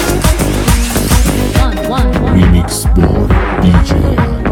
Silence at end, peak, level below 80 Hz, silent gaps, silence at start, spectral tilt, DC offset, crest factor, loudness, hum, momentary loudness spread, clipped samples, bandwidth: 0 s; 0 dBFS; -14 dBFS; none; 0 s; -5.5 dB/octave; under 0.1%; 10 dB; -11 LUFS; none; 4 LU; under 0.1%; 18.5 kHz